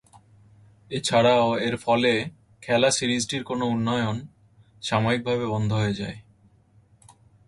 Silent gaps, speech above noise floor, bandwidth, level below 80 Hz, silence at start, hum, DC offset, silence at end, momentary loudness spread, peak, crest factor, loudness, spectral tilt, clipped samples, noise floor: none; 35 dB; 11.5 kHz; -56 dBFS; 0.9 s; none; under 0.1%; 1.25 s; 15 LU; -6 dBFS; 18 dB; -24 LUFS; -4.5 dB/octave; under 0.1%; -58 dBFS